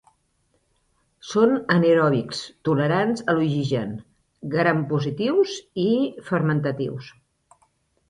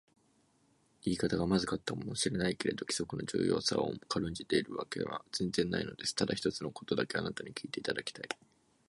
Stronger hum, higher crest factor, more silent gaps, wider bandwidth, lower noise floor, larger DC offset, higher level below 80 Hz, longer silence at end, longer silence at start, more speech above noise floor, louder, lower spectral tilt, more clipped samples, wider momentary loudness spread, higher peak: neither; about the same, 20 dB vs 20 dB; neither; about the same, 11 kHz vs 11.5 kHz; about the same, -68 dBFS vs -71 dBFS; neither; about the same, -62 dBFS vs -60 dBFS; first, 1 s vs 0.55 s; first, 1.25 s vs 1.05 s; first, 46 dB vs 36 dB; first, -22 LUFS vs -35 LUFS; first, -7 dB/octave vs -4.5 dB/octave; neither; first, 12 LU vs 9 LU; first, -4 dBFS vs -16 dBFS